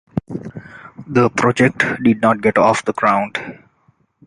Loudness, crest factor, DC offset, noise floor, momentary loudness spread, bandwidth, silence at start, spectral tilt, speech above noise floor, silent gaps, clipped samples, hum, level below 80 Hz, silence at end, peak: -16 LUFS; 16 dB; under 0.1%; -59 dBFS; 20 LU; 11 kHz; 0.15 s; -6 dB/octave; 43 dB; none; under 0.1%; none; -52 dBFS; 0.75 s; 0 dBFS